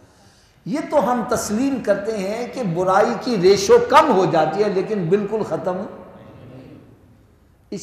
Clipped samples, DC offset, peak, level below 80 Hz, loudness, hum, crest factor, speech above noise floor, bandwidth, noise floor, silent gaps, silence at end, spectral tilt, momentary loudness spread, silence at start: under 0.1%; under 0.1%; 0 dBFS; -54 dBFS; -18 LUFS; none; 20 dB; 35 dB; 15.5 kHz; -53 dBFS; none; 0 s; -5 dB/octave; 14 LU; 0.65 s